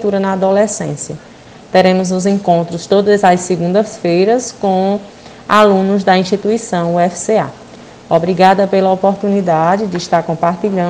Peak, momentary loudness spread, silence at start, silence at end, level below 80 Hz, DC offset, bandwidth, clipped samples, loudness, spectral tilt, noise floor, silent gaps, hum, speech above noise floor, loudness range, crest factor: 0 dBFS; 6 LU; 0 s; 0 s; -52 dBFS; under 0.1%; 9.8 kHz; 0.1%; -13 LUFS; -5.5 dB/octave; -35 dBFS; none; none; 23 dB; 1 LU; 12 dB